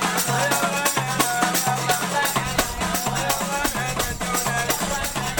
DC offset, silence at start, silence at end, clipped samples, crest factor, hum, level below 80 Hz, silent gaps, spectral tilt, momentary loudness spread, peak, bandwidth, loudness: 0.1%; 0 s; 0 s; under 0.1%; 18 dB; none; -40 dBFS; none; -2.5 dB/octave; 3 LU; -6 dBFS; 19.5 kHz; -22 LUFS